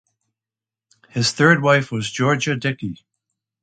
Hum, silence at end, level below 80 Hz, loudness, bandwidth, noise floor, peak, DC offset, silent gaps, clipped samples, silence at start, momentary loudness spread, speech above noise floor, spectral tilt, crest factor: none; 0.7 s; -60 dBFS; -18 LUFS; 9.4 kHz; -89 dBFS; 0 dBFS; under 0.1%; none; under 0.1%; 1.15 s; 15 LU; 71 dB; -5 dB/octave; 20 dB